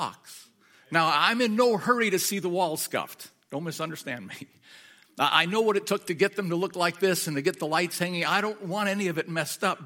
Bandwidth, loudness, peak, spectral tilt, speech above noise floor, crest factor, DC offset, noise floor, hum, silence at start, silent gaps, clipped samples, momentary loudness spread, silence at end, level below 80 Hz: 17 kHz; -26 LUFS; -4 dBFS; -3.5 dB/octave; 31 dB; 22 dB; under 0.1%; -57 dBFS; none; 0 s; none; under 0.1%; 14 LU; 0 s; -78 dBFS